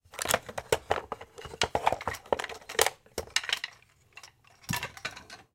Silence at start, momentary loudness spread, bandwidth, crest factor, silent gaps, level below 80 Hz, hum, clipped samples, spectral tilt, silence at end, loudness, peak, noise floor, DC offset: 0.15 s; 18 LU; 17 kHz; 28 dB; none; -56 dBFS; none; under 0.1%; -2 dB/octave; 0.1 s; -31 LUFS; -6 dBFS; -58 dBFS; under 0.1%